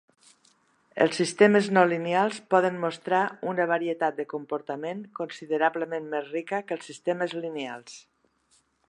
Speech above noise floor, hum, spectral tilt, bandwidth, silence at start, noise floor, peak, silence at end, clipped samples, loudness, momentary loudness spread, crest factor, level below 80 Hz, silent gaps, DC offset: 41 dB; none; -5 dB/octave; 10.5 kHz; 0.95 s; -67 dBFS; -4 dBFS; 0.9 s; under 0.1%; -26 LUFS; 14 LU; 22 dB; -80 dBFS; none; under 0.1%